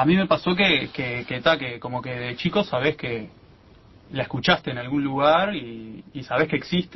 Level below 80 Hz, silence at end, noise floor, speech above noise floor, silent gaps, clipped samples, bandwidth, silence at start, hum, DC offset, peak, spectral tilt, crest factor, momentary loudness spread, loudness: -52 dBFS; 0 s; -51 dBFS; 28 dB; none; under 0.1%; 6 kHz; 0 s; none; under 0.1%; -6 dBFS; -6.5 dB/octave; 18 dB; 14 LU; -23 LUFS